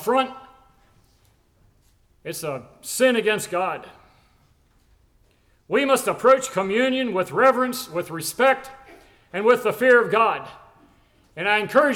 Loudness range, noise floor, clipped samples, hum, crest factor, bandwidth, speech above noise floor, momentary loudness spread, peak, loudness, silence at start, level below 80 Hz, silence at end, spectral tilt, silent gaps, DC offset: 6 LU; -60 dBFS; under 0.1%; none; 18 dB; 18 kHz; 40 dB; 15 LU; -6 dBFS; -21 LUFS; 0 s; -62 dBFS; 0 s; -3.5 dB/octave; none; under 0.1%